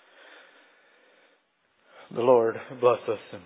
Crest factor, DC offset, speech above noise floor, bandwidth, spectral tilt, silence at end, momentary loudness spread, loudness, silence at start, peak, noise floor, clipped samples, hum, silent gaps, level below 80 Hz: 20 dB; under 0.1%; 45 dB; 4 kHz; -10 dB/octave; 0.05 s; 11 LU; -25 LUFS; 2.15 s; -8 dBFS; -69 dBFS; under 0.1%; none; none; -78 dBFS